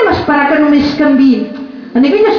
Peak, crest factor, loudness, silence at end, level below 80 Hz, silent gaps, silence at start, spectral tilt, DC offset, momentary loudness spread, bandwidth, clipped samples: 0 dBFS; 8 dB; -10 LUFS; 0 s; -40 dBFS; none; 0 s; -7 dB/octave; under 0.1%; 9 LU; 5.4 kHz; under 0.1%